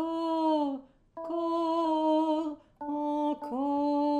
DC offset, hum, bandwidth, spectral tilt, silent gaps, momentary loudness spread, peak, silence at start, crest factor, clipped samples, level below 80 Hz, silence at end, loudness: under 0.1%; none; 8.6 kHz; -5.5 dB/octave; none; 12 LU; -18 dBFS; 0 s; 12 dB; under 0.1%; -68 dBFS; 0 s; -30 LUFS